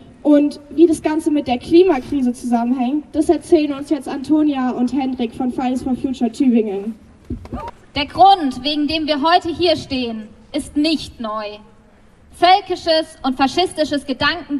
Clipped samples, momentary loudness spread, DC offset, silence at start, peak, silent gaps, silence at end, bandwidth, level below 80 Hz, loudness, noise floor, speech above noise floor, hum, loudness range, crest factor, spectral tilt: under 0.1%; 13 LU; under 0.1%; 0.25 s; -2 dBFS; none; 0 s; 12 kHz; -44 dBFS; -17 LUFS; -48 dBFS; 31 dB; none; 4 LU; 16 dB; -5 dB/octave